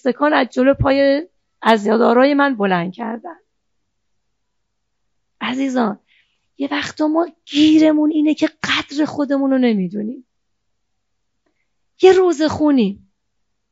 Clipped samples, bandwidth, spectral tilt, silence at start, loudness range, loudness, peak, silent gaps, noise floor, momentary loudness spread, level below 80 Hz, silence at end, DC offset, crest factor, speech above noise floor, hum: under 0.1%; 7.8 kHz; -4 dB/octave; 0.05 s; 10 LU; -16 LUFS; 0 dBFS; none; -75 dBFS; 14 LU; -46 dBFS; 0.75 s; under 0.1%; 18 dB; 60 dB; none